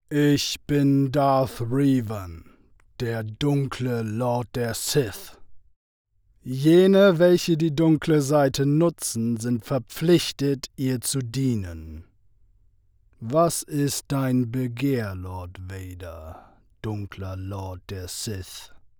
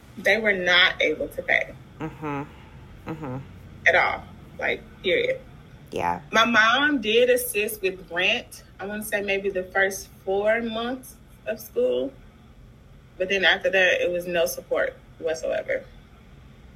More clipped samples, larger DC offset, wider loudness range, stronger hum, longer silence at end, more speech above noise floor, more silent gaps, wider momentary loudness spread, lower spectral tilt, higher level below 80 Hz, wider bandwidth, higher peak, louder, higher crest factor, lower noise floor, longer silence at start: neither; neither; first, 10 LU vs 5 LU; neither; first, 0.2 s vs 0.05 s; first, 37 dB vs 25 dB; first, 5.76-6.05 s vs none; about the same, 18 LU vs 16 LU; first, -6 dB/octave vs -3 dB/octave; about the same, -52 dBFS vs -52 dBFS; first, over 20 kHz vs 16 kHz; about the same, -6 dBFS vs -4 dBFS; about the same, -23 LUFS vs -23 LUFS; about the same, 18 dB vs 22 dB; first, -60 dBFS vs -49 dBFS; about the same, 0.1 s vs 0.15 s